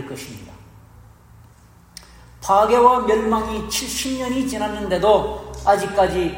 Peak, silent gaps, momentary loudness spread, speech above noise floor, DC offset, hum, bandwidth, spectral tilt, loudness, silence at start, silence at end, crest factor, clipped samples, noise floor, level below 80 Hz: -2 dBFS; none; 17 LU; 30 dB; under 0.1%; none; 16.5 kHz; -4 dB/octave; -19 LUFS; 0 s; 0 s; 20 dB; under 0.1%; -49 dBFS; -40 dBFS